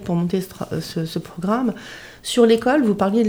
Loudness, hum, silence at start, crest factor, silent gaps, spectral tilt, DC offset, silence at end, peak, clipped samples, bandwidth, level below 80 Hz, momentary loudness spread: -20 LUFS; none; 0 s; 16 dB; none; -6 dB/octave; under 0.1%; 0 s; -2 dBFS; under 0.1%; over 20 kHz; -52 dBFS; 13 LU